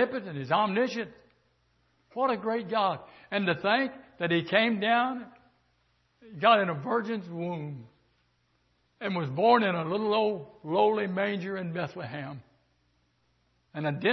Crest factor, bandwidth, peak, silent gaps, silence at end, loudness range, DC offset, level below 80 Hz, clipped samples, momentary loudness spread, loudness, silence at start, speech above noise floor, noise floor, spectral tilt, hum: 22 dB; 6.2 kHz; -8 dBFS; none; 0 s; 3 LU; under 0.1%; -72 dBFS; under 0.1%; 16 LU; -28 LUFS; 0 s; 43 dB; -71 dBFS; -7 dB/octave; none